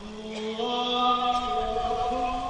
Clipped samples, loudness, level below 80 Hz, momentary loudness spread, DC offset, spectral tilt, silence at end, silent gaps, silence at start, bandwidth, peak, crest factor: under 0.1%; -27 LUFS; -44 dBFS; 10 LU; under 0.1%; -4 dB/octave; 0 s; none; 0 s; 10 kHz; -12 dBFS; 16 dB